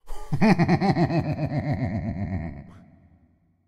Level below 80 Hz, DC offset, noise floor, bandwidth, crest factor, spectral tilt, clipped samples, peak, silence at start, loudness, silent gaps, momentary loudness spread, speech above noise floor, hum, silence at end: -44 dBFS; under 0.1%; -62 dBFS; 10.5 kHz; 20 dB; -8 dB/octave; under 0.1%; -6 dBFS; 0.05 s; -24 LUFS; none; 13 LU; 39 dB; none; 0.9 s